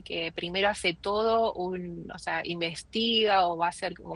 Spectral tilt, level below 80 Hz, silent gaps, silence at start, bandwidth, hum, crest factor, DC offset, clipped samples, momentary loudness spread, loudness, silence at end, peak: -4 dB/octave; -56 dBFS; none; 0.05 s; 11.5 kHz; none; 16 dB; under 0.1%; under 0.1%; 11 LU; -28 LUFS; 0 s; -12 dBFS